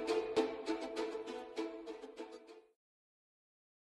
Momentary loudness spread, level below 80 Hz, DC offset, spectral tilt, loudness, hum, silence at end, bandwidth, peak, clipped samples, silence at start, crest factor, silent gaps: 18 LU; -76 dBFS; under 0.1%; -3.5 dB/octave; -41 LUFS; none; 1.25 s; 11.5 kHz; -22 dBFS; under 0.1%; 0 s; 22 dB; none